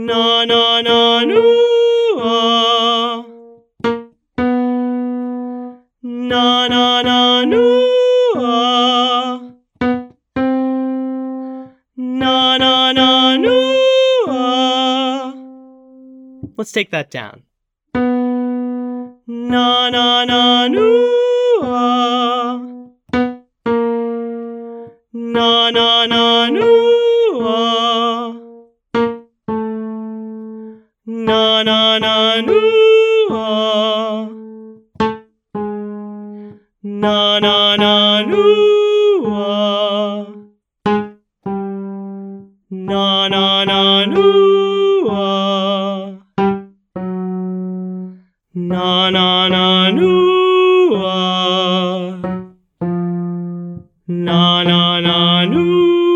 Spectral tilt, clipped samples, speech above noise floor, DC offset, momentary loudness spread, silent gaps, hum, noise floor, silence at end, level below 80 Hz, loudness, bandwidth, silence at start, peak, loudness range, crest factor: -5.5 dB/octave; under 0.1%; 29 dB; under 0.1%; 17 LU; none; none; -42 dBFS; 0 s; -54 dBFS; -13 LUFS; 9.8 kHz; 0 s; 0 dBFS; 8 LU; 14 dB